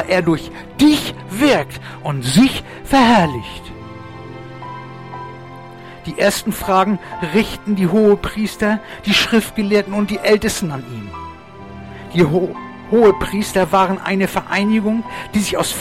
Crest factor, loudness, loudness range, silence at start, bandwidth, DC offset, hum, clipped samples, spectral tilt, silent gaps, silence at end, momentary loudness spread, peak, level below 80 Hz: 14 dB; -16 LUFS; 5 LU; 0 s; 16 kHz; 0.2%; none; under 0.1%; -5 dB/octave; none; 0 s; 20 LU; -2 dBFS; -40 dBFS